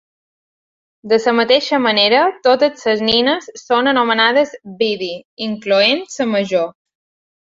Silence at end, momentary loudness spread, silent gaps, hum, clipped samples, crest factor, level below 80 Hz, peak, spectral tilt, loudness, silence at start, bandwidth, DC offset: 0.7 s; 10 LU; 5.25-5.37 s; none; under 0.1%; 16 dB; -60 dBFS; -2 dBFS; -3.5 dB/octave; -15 LUFS; 1.05 s; 7.8 kHz; under 0.1%